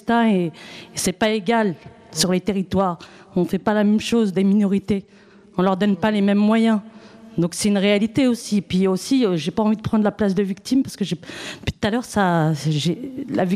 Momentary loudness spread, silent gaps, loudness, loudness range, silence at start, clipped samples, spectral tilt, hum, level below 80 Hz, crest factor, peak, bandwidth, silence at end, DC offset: 10 LU; none; -20 LUFS; 2 LU; 0.05 s; under 0.1%; -5.5 dB/octave; none; -52 dBFS; 16 dB; -4 dBFS; 15 kHz; 0 s; under 0.1%